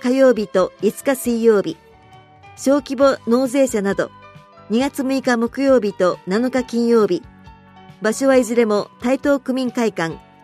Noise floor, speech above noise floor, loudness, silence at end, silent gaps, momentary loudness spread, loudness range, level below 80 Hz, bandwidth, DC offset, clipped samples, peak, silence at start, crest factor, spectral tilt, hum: -46 dBFS; 29 dB; -18 LUFS; 0.25 s; none; 8 LU; 1 LU; -52 dBFS; 15 kHz; under 0.1%; under 0.1%; -2 dBFS; 0 s; 16 dB; -5 dB/octave; none